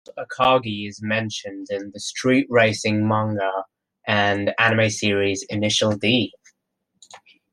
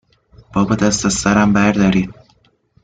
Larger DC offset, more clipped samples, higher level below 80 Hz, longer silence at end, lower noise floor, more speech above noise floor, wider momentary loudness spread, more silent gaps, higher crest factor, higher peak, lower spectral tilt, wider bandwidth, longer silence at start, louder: neither; neither; second, -62 dBFS vs -40 dBFS; second, 0.35 s vs 0.7 s; first, -75 dBFS vs -56 dBFS; first, 54 dB vs 42 dB; first, 12 LU vs 7 LU; neither; first, 20 dB vs 14 dB; about the same, -2 dBFS vs -2 dBFS; about the same, -4.5 dB/octave vs -5 dB/octave; first, 12 kHz vs 9.4 kHz; second, 0.15 s vs 0.55 s; second, -21 LUFS vs -15 LUFS